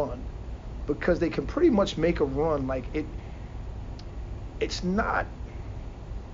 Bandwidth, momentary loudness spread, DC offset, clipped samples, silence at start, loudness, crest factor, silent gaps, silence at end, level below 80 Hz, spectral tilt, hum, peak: 7.6 kHz; 16 LU; under 0.1%; under 0.1%; 0 s; -28 LUFS; 18 dB; none; 0 s; -38 dBFS; -6.5 dB/octave; none; -10 dBFS